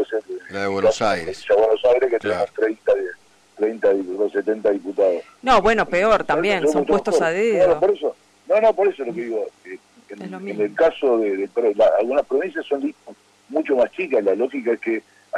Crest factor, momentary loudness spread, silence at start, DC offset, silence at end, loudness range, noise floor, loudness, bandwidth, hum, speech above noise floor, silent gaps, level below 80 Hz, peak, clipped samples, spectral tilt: 12 dB; 11 LU; 0 s; under 0.1%; 0 s; 4 LU; -44 dBFS; -20 LUFS; 11 kHz; none; 25 dB; none; -50 dBFS; -8 dBFS; under 0.1%; -5 dB/octave